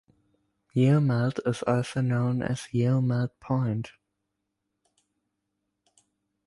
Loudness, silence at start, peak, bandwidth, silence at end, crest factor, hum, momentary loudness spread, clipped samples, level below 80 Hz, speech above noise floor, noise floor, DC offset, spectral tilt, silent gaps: -27 LUFS; 0.75 s; -12 dBFS; 11.5 kHz; 2.55 s; 16 dB; none; 8 LU; under 0.1%; -62 dBFS; 56 dB; -81 dBFS; under 0.1%; -7.5 dB/octave; none